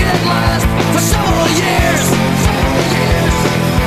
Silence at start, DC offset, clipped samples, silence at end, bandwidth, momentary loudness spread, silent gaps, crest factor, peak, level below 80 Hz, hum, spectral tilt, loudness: 0 s; 0.2%; under 0.1%; 0 s; 14 kHz; 1 LU; none; 12 dB; 0 dBFS; -22 dBFS; none; -4.5 dB/octave; -13 LUFS